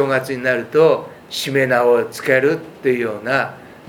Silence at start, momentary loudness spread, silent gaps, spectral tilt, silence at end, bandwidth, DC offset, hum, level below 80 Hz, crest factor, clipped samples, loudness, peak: 0 s; 7 LU; none; -5 dB/octave; 0.15 s; 18 kHz; under 0.1%; none; -62 dBFS; 16 dB; under 0.1%; -18 LUFS; 0 dBFS